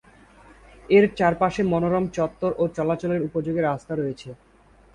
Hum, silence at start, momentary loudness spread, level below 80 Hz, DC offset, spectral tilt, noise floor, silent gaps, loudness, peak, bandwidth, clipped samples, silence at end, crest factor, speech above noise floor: none; 0.9 s; 10 LU; -52 dBFS; under 0.1%; -7.5 dB/octave; -51 dBFS; none; -23 LUFS; -6 dBFS; 10.5 kHz; under 0.1%; 0.6 s; 18 dB; 29 dB